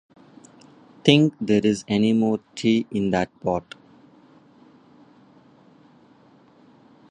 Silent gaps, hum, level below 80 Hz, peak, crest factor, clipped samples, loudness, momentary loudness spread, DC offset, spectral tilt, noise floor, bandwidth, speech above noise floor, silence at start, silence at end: none; none; -58 dBFS; 0 dBFS; 24 dB; under 0.1%; -21 LUFS; 9 LU; under 0.1%; -6 dB/octave; -54 dBFS; 10 kHz; 33 dB; 1.05 s; 3.5 s